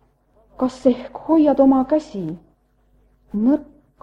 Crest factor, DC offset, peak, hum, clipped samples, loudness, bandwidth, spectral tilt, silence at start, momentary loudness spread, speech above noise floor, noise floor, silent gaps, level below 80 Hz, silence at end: 18 dB; under 0.1%; -2 dBFS; none; under 0.1%; -19 LUFS; 8 kHz; -8 dB/octave; 0.6 s; 15 LU; 42 dB; -59 dBFS; none; -52 dBFS; 0.4 s